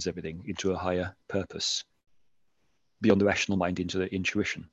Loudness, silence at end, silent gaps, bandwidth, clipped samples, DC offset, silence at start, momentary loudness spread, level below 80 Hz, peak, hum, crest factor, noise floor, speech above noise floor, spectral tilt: -29 LUFS; 0.05 s; none; 8.4 kHz; under 0.1%; under 0.1%; 0 s; 10 LU; -52 dBFS; -8 dBFS; none; 22 dB; -77 dBFS; 48 dB; -4.5 dB/octave